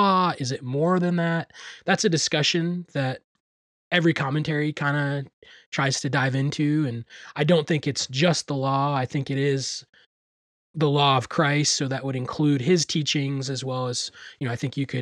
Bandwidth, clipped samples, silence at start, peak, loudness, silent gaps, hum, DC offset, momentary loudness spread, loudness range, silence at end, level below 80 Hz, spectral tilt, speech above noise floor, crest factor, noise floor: 11 kHz; under 0.1%; 0 s; -8 dBFS; -24 LUFS; 3.24-3.91 s, 5.33-5.42 s, 5.66-5.72 s, 10.06-10.74 s; none; under 0.1%; 10 LU; 3 LU; 0 s; -66 dBFS; -4.5 dB/octave; over 66 dB; 16 dB; under -90 dBFS